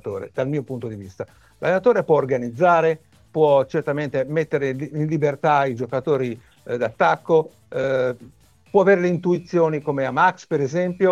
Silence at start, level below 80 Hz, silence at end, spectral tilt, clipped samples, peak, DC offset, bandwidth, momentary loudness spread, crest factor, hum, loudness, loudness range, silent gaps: 0.05 s; -60 dBFS; 0 s; -7.5 dB/octave; under 0.1%; -4 dBFS; under 0.1%; 9 kHz; 13 LU; 16 dB; none; -21 LUFS; 2 LU; none